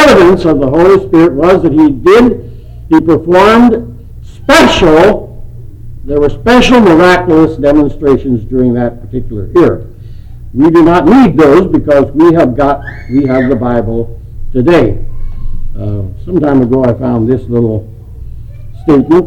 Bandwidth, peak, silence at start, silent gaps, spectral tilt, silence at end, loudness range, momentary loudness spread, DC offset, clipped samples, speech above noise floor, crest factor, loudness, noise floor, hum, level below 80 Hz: 15.5 kHz; 0 dBFS; 0 s; none; -6.5 dB/octave; 0 s; 6 LU; 16 LU; under 0.1%; under 0.1%; 20 dB; 8 dB; -8 LUFS; -27 dBFS; none; -24 dBFS